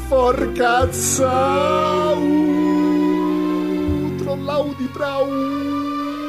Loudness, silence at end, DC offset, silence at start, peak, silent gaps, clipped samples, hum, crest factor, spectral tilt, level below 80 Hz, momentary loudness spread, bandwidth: -19 LUFS; 0 s; 0.3%; 0 s; -4 dBFS; none; under 0.1%; none; 14 dB; -5 dB/octave; -38 dBFS; 6 LU; 15.5 kHz